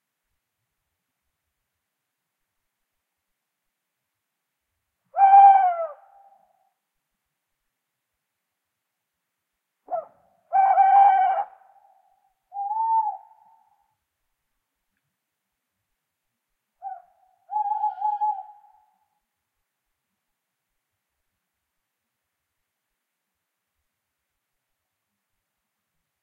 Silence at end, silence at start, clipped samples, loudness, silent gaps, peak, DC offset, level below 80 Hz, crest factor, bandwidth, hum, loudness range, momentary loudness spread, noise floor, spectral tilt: 7.8 s; 5.15 s; under 0.1%; -19 LUFS; none; -4 dBFS; under 0.1%; -90 dBFS; 22 dB; 3.3 kHz; none; 16 LU; 25 LU; -82 dBFS; -3 dB/octave